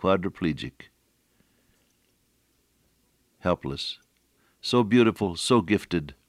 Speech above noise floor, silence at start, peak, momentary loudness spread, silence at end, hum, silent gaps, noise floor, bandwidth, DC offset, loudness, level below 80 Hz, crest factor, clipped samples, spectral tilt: 44 dB; 0 s; -8 dBFS; 14 LU; 0.15 s; none; none; -69 dBFS; 14.5 kHz; under 0.1%; -25 LUFS; -58 dBFS; 20 dB; under 0.1%; -5.5 dB/octave